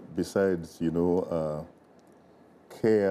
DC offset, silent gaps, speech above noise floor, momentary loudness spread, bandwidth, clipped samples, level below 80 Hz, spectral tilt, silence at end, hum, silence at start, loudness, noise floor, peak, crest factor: under 0.1%; none; 30 dB; 9 LU; 14 kHz; under 0.1%; -58 dBFS; -7.5 dB/octave; 0 s; none; 0 s; -28 LUFS; -57 dBFS; -14 dBFS; 16 dB